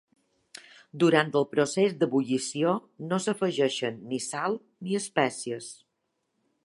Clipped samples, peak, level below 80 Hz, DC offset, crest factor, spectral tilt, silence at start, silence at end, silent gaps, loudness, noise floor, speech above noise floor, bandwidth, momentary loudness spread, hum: under 0.1%; -6 dBFS; -78 dBFS; under 0.1%; 24 dB; -4.5 dB/octave; 0.95 s; 0.9 s; none; -27 LUFS; -79 dBFS; 52 dB; 11.5 kHz; 14 LU; none